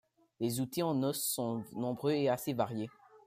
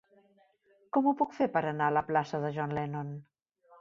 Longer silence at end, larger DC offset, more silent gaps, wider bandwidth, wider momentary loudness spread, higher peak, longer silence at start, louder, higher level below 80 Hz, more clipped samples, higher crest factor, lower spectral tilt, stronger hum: second, 0.1 s vs 0.6 s; neither; neither; first, 15.5 kHz vs 7.4 kHz; second, 7 LU vs 10 LU; about the same, -16 dBFS vs -14 dBFS; second, 0.4 s vs 0.95 s; second, -35 LUFS vs -31 LUFS; second, -76 dBFS vs -70 dBFS; neither; about the same, 18 dB vs 18 dB; second, -5 dB/octave vs -8 dB/octave; neither